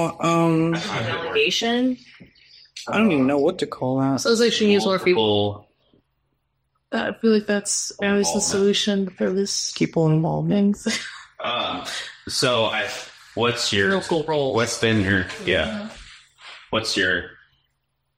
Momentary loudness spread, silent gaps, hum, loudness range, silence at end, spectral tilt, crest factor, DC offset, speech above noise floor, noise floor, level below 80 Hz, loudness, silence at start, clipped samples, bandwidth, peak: 11 LU; none; none; 3 LU; 0.85 s; -4 dB/octave; 16 dB; under 0.1%; 52 dB; -74 dBFS; -56 dBFS; -21 LUFS; 0 s; under 0.1%; 16 kHz; -6 dBFS